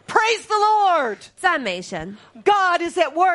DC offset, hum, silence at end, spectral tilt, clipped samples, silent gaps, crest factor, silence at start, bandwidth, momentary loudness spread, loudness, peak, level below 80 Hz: under 0.1%; none; 0 s; -3 dB/octave; under 0.1%; none; 18 dB; 0.1 s; 11.5 kHz; 12 LU; -19 LUFS; -2 dBFS; -58 dBFS